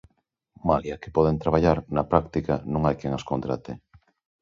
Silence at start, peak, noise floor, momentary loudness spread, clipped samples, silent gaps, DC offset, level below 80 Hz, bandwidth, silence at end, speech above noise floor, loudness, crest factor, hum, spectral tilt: 0.65 s; -2 dBFS; -71 dBFS; 9 LU; under 0.1%; none; under 0.1%; -42 dBFS; 7.4 kHz; 0.65 s; 47 dB; -25 LUFS; 24 dB; none; -8.5 dB/octave